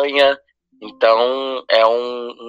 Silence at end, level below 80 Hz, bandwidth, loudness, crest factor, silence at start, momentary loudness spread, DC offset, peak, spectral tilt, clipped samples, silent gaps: 0 s; -64 dBFS; 8 kHz; -16 LUFS; 16 dB; 0 s; 10 LU; under 0.1%; 0 dBFS; -3 dB/octave; under 0.1%; none